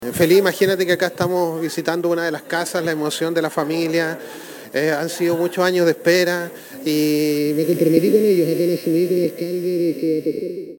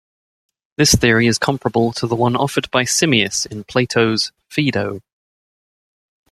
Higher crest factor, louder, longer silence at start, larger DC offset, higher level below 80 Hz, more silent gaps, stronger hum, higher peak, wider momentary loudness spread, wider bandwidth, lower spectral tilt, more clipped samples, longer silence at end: about the same, 18 dB vs 18 dB; about the same, -19 LUFS vs -17 LUFS; second, 0 s vs 0.8 s; neither; second, -64 dBFS vs -42 dBFS; neither; neither; about the same, 0 dBFS vs 0 dBFS; about the same, 8 LU vs 9 LU; first, 18.5 kHz vs 14.5 kHz; about the same, -5 dB/octave vs -4 dB/octave; neither; second, 0 s vs 1.3 s